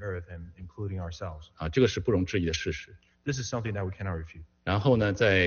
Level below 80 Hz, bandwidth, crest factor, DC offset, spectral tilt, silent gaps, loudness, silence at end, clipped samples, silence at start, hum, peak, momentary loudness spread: -48 dBFS; 7 kHz; 18 dB; under 0.1%; -5 dB/octave; none; -30 LUFS; 0 s; under 0.1%; 0 s; none; -10 dBFS; 16 LU